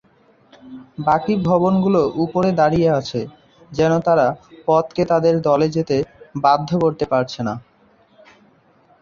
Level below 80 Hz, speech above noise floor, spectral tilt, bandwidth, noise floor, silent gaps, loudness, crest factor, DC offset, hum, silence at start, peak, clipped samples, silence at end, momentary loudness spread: -50 dBFS; 37 dB; -7.5 dB/octave; 7.2 kHz; -55 dBFS; none; -18 LUFS; 16 dB; under 0.1%; none; 0.65 s; -2 dBFS; under 0.1%; 1.45 s; 11 LU